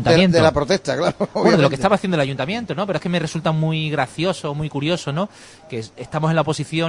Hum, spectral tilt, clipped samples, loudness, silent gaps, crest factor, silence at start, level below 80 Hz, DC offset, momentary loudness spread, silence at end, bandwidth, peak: none; -6 dB/octave; under 0.1%; -19 LUFS; none; 20 dB; 0 s; -46 dBFS; under 0.1%; 10 LU; 0 s; 11 kHz; 0 dBFS